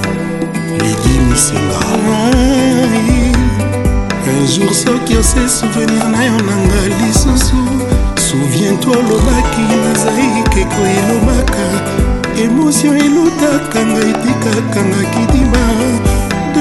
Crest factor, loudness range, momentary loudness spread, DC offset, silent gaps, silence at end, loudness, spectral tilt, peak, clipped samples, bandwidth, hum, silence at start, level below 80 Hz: 10 dB; 1 LU; 4 LU; under 0.1%; none; 0 s; -12 LUFS; -5 dB/octave; 0 dBFS; 0.1%; 12.5 kHz; none; 0 s; -18 dBFS